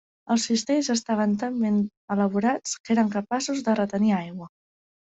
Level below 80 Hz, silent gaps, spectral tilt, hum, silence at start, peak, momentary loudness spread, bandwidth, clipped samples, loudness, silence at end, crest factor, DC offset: -66 dBFS; 1.97-2.08 s, 2.80-2.84 s; -5 dB/octave; none; 0.3 s; -10 dBFS; 5 LU; 8.4 kHz; under 0.1%; -25 LUFS; 0.6 s; 16 dB; under 0.1%